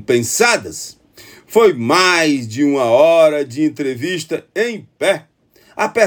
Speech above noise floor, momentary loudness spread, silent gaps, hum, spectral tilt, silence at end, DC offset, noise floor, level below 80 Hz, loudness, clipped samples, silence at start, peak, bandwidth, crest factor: 28 dB; 12 LU; none; none; -3.5 dB/octave; 0 s; under 0.1%; -43 dBFS; -60 dBFS; -15 LUFS; under 0.1%; 0 s; 0 dBFS; over 20 kHz; 14 dB